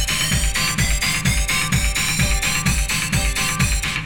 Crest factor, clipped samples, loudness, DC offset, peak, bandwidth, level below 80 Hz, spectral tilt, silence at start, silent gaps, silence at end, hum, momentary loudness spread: 14 dB; under 0.1%; -18 LUFS; under 0.1%; -6 dBFS; 19 kHz; -24 dBFS; -2.5 dB/octave; 0 s; none; 0 s; none; 1 LU